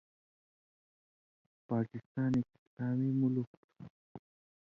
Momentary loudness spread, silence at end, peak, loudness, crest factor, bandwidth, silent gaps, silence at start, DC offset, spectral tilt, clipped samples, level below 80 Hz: 23 LU; 0.5 s; -22 dBFS; -35 LUFS; 16 dB; 6.8 kHz; 2.06-2.15 s, 2.59-2.77 s, 3.47-3.69 s, 3.90-4.15 s; 1.7 s; under 0.1%; -10 dB/octave; under 0.1%; -70 dBFS